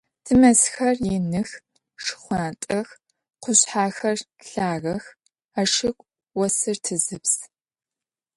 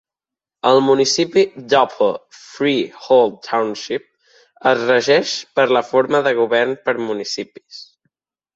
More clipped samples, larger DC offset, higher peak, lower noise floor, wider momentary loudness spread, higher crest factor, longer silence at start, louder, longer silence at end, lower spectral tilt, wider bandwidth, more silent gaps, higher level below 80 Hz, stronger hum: neither; neither; about the same, -2 dBFS vs -2 dBFS; about the same, under -90 dBFS vs -88 dBFS; first, 16 LU vs 12 LU; about the same, 20 dB vs 16 dB; second, 0.25 s vs 0.65 s; second, -22 LUFS vs -17 LUFS; first, 0.9 s vs 0.7 s; about the same, -3.5 dB/octave vs -3.5 dB/octave; first, 11.5 kHz vs 8 kHz; first, 5.45-5.49 s vs none; first, -52 dBFS vs -66 dBFS; neither